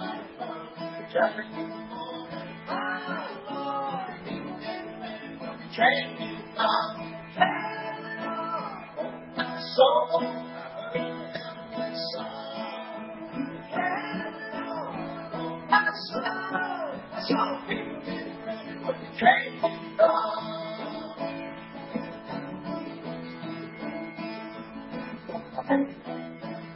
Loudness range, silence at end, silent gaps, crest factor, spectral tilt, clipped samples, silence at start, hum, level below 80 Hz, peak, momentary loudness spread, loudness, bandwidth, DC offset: 9 LU; 0 s; none; 26 dB; -8.5 dB/octave; under 0.1%; 0 s; none; -68 dBFS; -4 dBFS; 15 LU; -30 LUFS; 5.8 kHz; under 0.1%